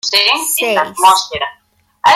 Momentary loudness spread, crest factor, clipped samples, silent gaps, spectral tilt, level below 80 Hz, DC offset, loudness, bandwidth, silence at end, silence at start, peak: 11 LU; 14 dB; under 0.1%; none; 0 dB/octave; -54 dBFS; under 0.1%; -12 LUFS; 16 kHz; 0 s; 0.05 s; 0 dBFS